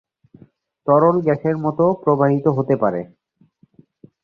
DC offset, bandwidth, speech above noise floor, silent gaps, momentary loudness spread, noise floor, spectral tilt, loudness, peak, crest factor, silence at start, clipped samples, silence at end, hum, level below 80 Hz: under 0.1%; 6.4 kHz; 40 dB; none; 11 LU; -57 dBFS; -11.5 dB/octave; -18 LUFS; -2 dBFS; 16 dB; 0.85 s; under 0.1%; 1.2 s; none; -58 dBFS